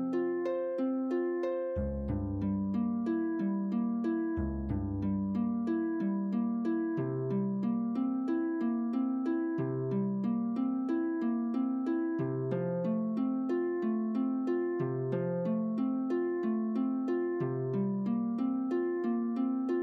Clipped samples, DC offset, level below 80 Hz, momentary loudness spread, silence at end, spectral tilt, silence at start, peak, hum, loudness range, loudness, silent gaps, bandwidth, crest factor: under 0.1%; under 0.1%; -52 dBFS; 2 LU; 0 s; -10.5 dB/octave; 0 s; -22 dBFS; none; 1 LU; -33 LUFS; none; 4.9 kHz; 10 dB